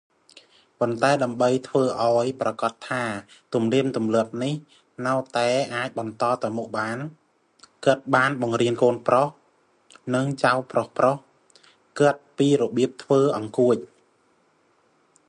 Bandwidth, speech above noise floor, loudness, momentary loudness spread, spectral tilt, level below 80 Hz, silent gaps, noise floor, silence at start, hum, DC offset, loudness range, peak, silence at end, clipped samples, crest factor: 11 kHz; 41 dB; -23 LUFS; 9 LU; -6 dB/octave; -70 dBFS; none; -64 dBFS; 0.8 s; none; under 0.1%; 3 LU; -4 dBFS; 1.45 s; under 0.1%; 20 dB